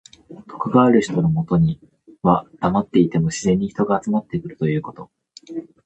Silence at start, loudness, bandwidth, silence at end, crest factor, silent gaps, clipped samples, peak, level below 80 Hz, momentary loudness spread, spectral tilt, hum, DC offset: 0.3 s; -19 LUFS; 8.6 kHz; 0.25 s; 18 dB; none; under 0.1%; -2 dBFS; -48 dBFS; 17 LU; -7.5 dB/octave; none; under 0.1%